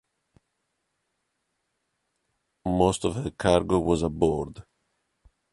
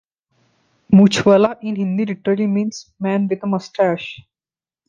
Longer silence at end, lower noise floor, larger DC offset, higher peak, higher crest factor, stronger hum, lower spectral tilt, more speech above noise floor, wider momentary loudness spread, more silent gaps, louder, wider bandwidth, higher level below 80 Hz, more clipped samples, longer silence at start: first, 0.9 s vs 0.7 s; second, -78 dBFS vs under -90 dBFS; neither; second, -6 dBFS vs -2 dBFS; first, 22 dB vs 16 dB; neither; about the same, -6 dB/octave vs -6.5 dB/octave; second, 54 dB vs over 74 dB; second, 9 LU vs 12 LU; neither; second, -25 LUFS vs -17 LUFS; first, 11.5 kHz vs 9 kHz; first, -46 dBFS vs -56 dBFS; neither; first, 2.65 s vs 0.9 s